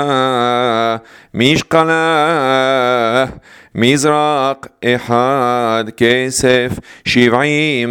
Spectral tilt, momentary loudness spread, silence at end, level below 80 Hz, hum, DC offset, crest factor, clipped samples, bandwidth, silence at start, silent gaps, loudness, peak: -4.5 dB/octave; 7 LU; 0 s; -46 dBFS; none; under 0.1%; 14 dB; under 0.1%; 17.5 kHz; 0 s; none; -13 LUFS; 0 dBFS